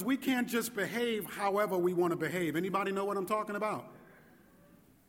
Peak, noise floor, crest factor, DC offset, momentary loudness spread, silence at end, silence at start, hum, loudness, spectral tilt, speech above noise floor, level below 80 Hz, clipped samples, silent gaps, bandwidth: -18 dBFS; -62 dBFS; 16 dB; under 0.1%; 5 LU; 1.05 s; 0 s; none; -33 LUFS; -5 dB/octave; 29 dB; -74 dBFS; under 0.1%; none; 18 kHz